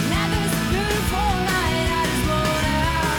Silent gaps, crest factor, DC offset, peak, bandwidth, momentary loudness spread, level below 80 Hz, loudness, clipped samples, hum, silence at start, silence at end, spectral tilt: none; 10 dB; under 0.1%; -10 dBFS; 19.5 kHz; 1 LU; -30 dBFS; -21 LUFS; under 0.1%; none; 0 s; 0 s; -4.5 dB/octave